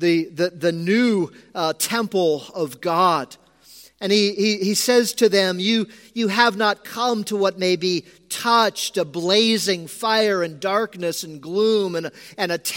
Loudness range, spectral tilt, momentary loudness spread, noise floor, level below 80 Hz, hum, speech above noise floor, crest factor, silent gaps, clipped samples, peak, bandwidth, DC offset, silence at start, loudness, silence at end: 3 LU; -3.5 dB/octave; 9 LU; -48 dBFS; -70 dBFS; none; 28 dB; 20 dB; none; under 0.1%; 0 dBFS; 17 kHz; under 0.1%; 0 s; -20 LUFS; 0 s